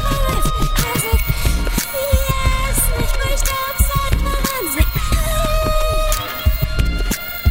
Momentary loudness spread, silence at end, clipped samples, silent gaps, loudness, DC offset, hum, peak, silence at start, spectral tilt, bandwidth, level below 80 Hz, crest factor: 3 LU; 0 s; under 0.1%; none; -19 LUFS; under 0.1%; none; 0 dBFS; 0 s; -4 dB/octave; 16.5 kHz; -18 dBFS; 16 dB